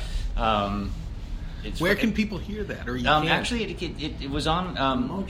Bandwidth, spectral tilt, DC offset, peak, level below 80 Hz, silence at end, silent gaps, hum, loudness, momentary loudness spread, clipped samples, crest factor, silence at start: 16 kHz; -5.5 dB/octave; under 0.1%; -6 dBFS; -34 dBFS; 0 s; none; none; -26 LUFS; 13 LU; under 0.1%; 20 dB; 0 s